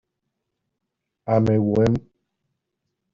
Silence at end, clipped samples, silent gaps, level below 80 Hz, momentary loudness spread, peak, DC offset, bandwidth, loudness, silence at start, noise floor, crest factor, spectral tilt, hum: 1.15 s; under 0.1%; none; -50 dBFS; 9 LU; -6 dBFS; under 0.1%; 7.4 kHz; -21 LUFS; 1.25 s; -81 dBFS; 20 dB; -9 dB/octave; none